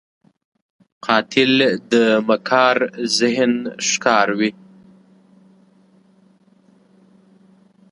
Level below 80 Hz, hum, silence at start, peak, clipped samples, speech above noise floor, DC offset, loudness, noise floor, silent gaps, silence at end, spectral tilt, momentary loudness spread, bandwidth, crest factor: -68 dBFS; none; 1.05 s; 0 dBFS; under 0.1%; 37 dB; under 0.1%; -17 LUFS; -54 dBFS; none; 3.4 s; -3 dB/octave; 5 LU; 11.5 kHz; 20 dB